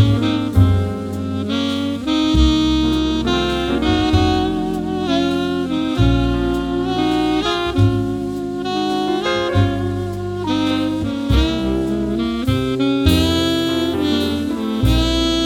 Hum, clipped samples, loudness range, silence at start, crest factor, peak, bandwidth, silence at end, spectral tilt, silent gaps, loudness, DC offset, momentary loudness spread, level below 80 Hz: none; under 0.1%; 2 LU; 0 s; 16 dB; 0 dBFS; 17 kHz; 0 s; -6.5 dB/octave; none; -18 LUFS; under 0.1%; 6 LU; -26 dBFS